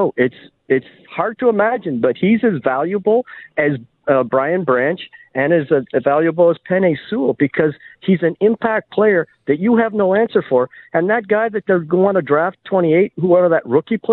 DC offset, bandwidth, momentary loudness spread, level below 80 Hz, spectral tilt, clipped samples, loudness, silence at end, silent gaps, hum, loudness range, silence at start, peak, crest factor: under 0.1%; 4.2 kHz; 5 LU; -60 dBFS; -11 dB/octave; under 0.1%; -17 LUFS; 0 s; none; none; 2 LU; 0 s; -2 dBFS; 14 dB